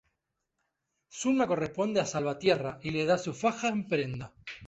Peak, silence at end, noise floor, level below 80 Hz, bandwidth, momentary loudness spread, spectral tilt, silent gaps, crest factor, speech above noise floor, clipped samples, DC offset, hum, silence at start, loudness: -12 dBFS; 0 s; -83 dBFS; -64 dBFS; 8.2 kHz; 8 LU; -5 dB/octave; none; 18 dB; 53 dB; under 0.1%; under 0.1%; none; 1.15 s; -30 LUFS